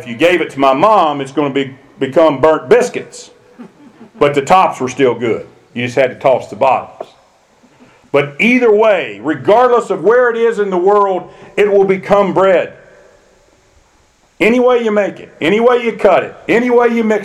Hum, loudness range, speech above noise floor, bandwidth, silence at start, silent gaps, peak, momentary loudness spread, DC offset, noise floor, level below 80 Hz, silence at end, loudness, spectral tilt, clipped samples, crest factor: none; 4 LU; 40 dB; 12.5 kHz; 0 s; none; 0 dBFS; 10 LU; under 0.1%; -52 dBFS; -50 dBFS; 0 s; -12 LUFS; -5.5 dB/octave; under 0.1%; 12 dB